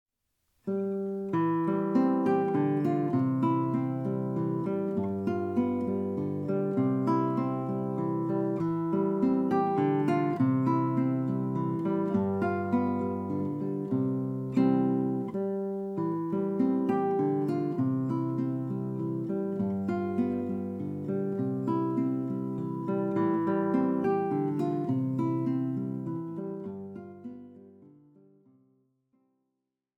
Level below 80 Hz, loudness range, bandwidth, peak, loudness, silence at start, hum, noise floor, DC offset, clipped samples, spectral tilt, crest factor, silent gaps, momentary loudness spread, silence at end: -72 dBFS; 4 LU; 5.6 kHz; -14 dBFS; -29 LUFS; 0.65 s; none; -84 dBFS; under 0.1%; under 0.1%; -10.5 dB/octave; 14 dB; none; 7 LU; 2.1 s